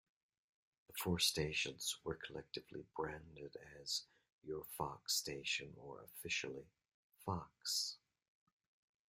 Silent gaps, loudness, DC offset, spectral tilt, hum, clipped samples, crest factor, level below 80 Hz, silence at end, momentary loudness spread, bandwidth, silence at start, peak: 4.32-4.42 s, 6.94-7.10 s; -42 LUFS; under 0.1%; -2.5 dB/octave; none; under 0.1%; 24 dB; -70 dBFS; 1.1 s; 17 LU; 16 kHz; 0.9 s; -22 dBFS